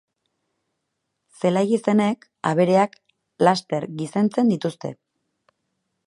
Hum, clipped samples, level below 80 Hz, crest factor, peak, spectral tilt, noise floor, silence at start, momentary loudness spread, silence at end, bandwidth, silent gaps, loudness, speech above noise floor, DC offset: none; under 0.1%; -70 dBFS; 22 dB; -2 dBFS; -6.5 dB/octave; -78 dBFS; 1.45 s; 9 LU; 1.15 s; 11.5 kHz; none; -21 LUFS; 57 dB; under 0.1%